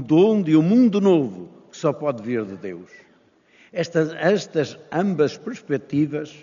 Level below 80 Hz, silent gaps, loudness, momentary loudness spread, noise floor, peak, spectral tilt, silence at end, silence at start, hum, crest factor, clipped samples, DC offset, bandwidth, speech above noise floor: -68 dBFS; none; -21 LUFS; 17 LU; -57 dBFS; -6 dBFS; -6.5 dB/octave; 0.1 s; 0 s; none; 16 dB; under 0.1%; under 0.1%; 7.2 kHz; 37 dB